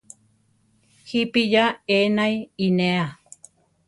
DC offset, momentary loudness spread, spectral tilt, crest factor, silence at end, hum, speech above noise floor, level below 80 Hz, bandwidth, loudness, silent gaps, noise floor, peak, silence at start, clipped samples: under 0.1%; 7 LU; -6 dB/octave; 18 dB; 0.75 s; none; 42 dB; -64 dBFS; 11.5 kHz; -21 LUFS; none; -63 dBFS; -6 dBFS; 1.05 s; under 0.1%